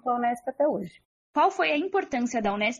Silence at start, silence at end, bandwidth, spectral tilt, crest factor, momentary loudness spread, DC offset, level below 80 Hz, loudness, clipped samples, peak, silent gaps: 0.05 s; 0 s; 12.5 kHz; -4.5 dB/octave; 16 dB; 8 LU; under 0.1%; -64 dBFS; -26 LUFS; under 0.1%; -10 dBFS; 1.05-1.34 s